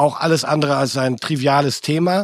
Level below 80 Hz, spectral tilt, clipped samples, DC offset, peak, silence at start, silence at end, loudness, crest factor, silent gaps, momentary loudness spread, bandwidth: -62 dBFS; -5 dB/octave; under 0.1%; under 0.1%; -2 dBFS; 0 s; 0 s; -18 LUFS; 16 dB; none; 3 LU; 15 kHz